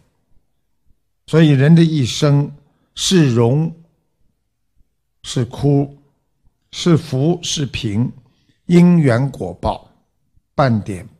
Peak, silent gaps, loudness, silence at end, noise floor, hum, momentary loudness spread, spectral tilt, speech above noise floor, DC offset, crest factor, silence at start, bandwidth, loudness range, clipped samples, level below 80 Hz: 0 dBFS; none; -16 LUFS; 0.15 s; -69 dBFS; none; 15 LU; -6.5 dB/octave; 55 dB; under 0.1%; 16 dB; 1.3 s; 12 kHz; 6 LU; under 0.1%; -44 dBFS